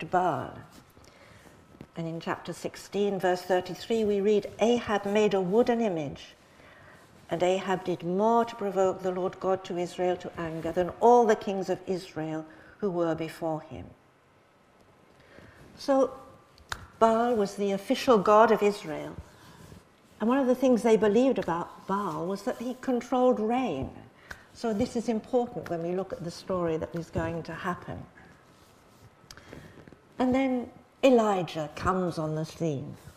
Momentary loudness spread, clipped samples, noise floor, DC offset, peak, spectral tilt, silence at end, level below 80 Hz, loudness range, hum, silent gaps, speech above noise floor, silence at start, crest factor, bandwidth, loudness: 16 LU; under 0.1%; -61 dBFS; under 0.1%; -6 dBFS; -6 dB/octave; 0.05 s; -58 dBFS; 9 LU; none; none; 34 dB; 0 s; 22 dB; 15.5 kHz; -28 LUFS